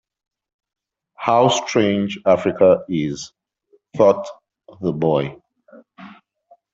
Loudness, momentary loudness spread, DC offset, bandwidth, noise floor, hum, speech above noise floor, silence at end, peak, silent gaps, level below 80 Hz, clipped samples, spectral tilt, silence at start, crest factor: -18 LUFS; 15 LU; under 0.1%; 8 kHz; -60 dBFS; none; 43 dB; 0.6 s; -2 dBFS; none; -60 dBFS; under 0.1%; -5.5 dB/octave; 1.2 s; 18 dB